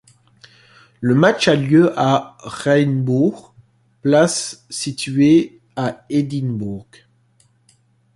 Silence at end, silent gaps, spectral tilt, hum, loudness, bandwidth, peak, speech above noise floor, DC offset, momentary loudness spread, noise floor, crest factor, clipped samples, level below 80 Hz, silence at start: 1.35 s; none; -5.5 dB/octave; none; -17 LUFS; 11.5 kHz; -2 dBFS; 41 dB; under 0.1%; 12 LU; -58 dBFS; 16 dB; under 0.1%; -56 dBFS; 1 s